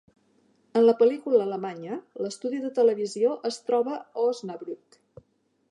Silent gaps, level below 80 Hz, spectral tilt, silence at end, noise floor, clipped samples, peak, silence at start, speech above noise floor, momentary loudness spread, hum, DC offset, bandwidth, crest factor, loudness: none; -78 dBFS; -5.5 dB/octave; 0.95 s; -69 dBFS; under 0.1%; -8 dBFS; 0.75 s; 44 dB; 15 LU; none; under 0.1%; 10.5 kHz; 18 dB; -26 LUFS